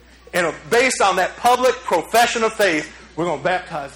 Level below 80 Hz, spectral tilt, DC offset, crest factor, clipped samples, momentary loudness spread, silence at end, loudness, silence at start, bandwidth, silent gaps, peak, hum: -50 dBFS; -2.5 dB/octave; under 0.1%; 16 dB; under 0.1%; 8 LU; 0 s; -18 LUFS; 0.35 s; over 20 kHz; none; -4 dBFS; none